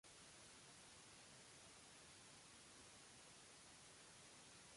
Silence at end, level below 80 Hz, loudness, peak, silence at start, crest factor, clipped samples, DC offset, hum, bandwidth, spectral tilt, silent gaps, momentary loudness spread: 0 s; -84 dBFS; -62 LUFS; -52 dBFS; 0.05 s; 14 dB; under 0.1%; under 0.1%; none; 11.5 kHz; -1.5 dB/octave; none; 0 LU